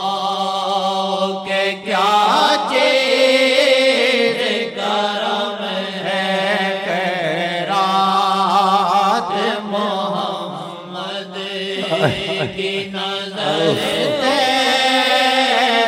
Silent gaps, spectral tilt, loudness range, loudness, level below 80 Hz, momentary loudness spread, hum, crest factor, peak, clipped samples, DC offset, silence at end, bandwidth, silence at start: none; -3.5 dB/octave; 7 LU; -17 LUFS; -60 dBFS; 9 LU; none; 16 dB; 0 dBFS; under 0.1%; under 0.1%; 0 s; 16.5 kHz; 0 s